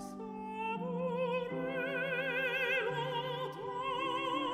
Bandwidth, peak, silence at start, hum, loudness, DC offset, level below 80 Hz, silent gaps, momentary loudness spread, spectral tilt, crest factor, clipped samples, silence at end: 13.5 kHz; -22 dBFS; 0 s; none; -36 LUFS; under 0.1%; -70 dBFS; none; 7 LU; -5.5 dB/octave; 14 dB; under 0.1%; 0 s